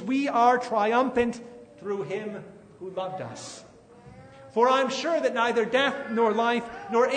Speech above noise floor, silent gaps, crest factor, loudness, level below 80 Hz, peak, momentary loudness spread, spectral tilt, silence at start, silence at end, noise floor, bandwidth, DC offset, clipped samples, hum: 25 dB; none; 18 dB; -25 LUFS; -64 dBFS; -8 dBFS; 18 LU; -4.5 dB/octave; 0 s; 0 s; -50 dBFS; 9.6 kHz; under 0.1%; under 0.1%; none